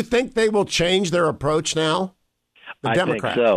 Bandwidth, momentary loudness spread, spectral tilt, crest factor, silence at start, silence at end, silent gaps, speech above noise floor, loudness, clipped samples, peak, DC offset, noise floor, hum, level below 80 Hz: 14 kHz; 7 LU; -4 dB/octave; 14 dB; 0 s; 0 s; none; 37 dB; -20 LUFS; under 0.1%; -8 dBFS; under 0.1%; -57 dBFS; none; -48 dBFS